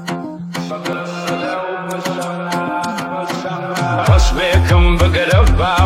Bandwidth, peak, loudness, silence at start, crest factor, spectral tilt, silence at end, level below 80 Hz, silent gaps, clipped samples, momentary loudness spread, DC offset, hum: 15 kHz; 0 dBFS; -16 LUFS; 0 s; 14 dB; -5.5 dB/octave; 0 s; -20 dBFS; none; under 0.1%; 10 LU; under 0.1%; none